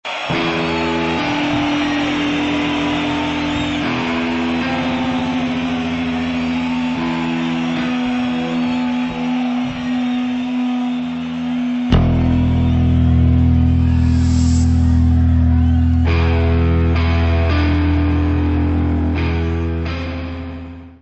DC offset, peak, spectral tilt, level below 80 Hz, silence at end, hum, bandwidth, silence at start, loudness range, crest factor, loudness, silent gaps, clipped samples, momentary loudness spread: under 0.1%; -2 dBFS; -7 dB/octave; -24 dBFS; 0.05 s; none; 8.2 kHz; 0.05 s; 5 LU; 14 dB; -17 LUFS; none; under 0.1%; 6 LU